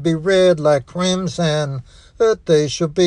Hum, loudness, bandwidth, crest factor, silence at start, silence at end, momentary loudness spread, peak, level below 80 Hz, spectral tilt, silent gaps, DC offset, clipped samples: none; -17 LUFS; 10.5 kHz; 14 dB; 0 s; 0 s; 7 LU; -2 dBFS; -46 dBFS; -5.5 dB/octave; none; under 0.1%; under 0.1%